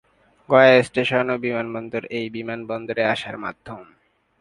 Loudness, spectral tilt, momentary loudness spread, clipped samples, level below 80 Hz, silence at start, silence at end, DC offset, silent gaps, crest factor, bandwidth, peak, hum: -20 LUFS; -6 dB/octave; 18 LU; under 0.1%; -60 dBFS; 0.5 s; 0.55 s; under 0.1%; none; 22 dB; 11 kHz; 0 dBFS; none